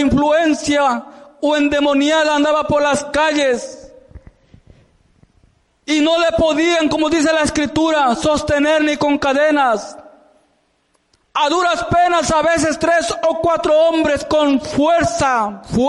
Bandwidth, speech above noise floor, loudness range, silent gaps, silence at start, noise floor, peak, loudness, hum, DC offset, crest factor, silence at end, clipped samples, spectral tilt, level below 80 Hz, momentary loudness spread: 11.5 kHz; 47 dB; 4 LU; none; 0 s; -62 dBFS; -6 dBFS; -15 LUFS; none; under 0.1%; 10 dB; 0 s; under 0.1%; -4 dB/octave; -42 dBFS; 5 LU